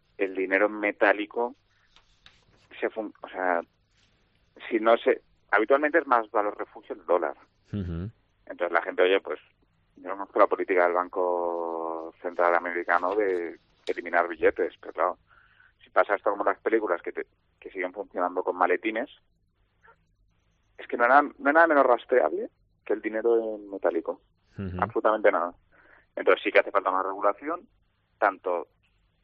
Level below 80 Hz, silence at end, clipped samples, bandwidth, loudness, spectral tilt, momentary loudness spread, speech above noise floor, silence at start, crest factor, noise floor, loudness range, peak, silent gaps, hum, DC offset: -66 dBFS; 0.6 s; under 0.1%; 5.8 kHz; -26 LUFS; -3 dB/octave; 15 LU; 44 dB; 0.2 s; 24 dB; -69 dBFS; 6 LU; -4 dBFS; none; none; under 0.1%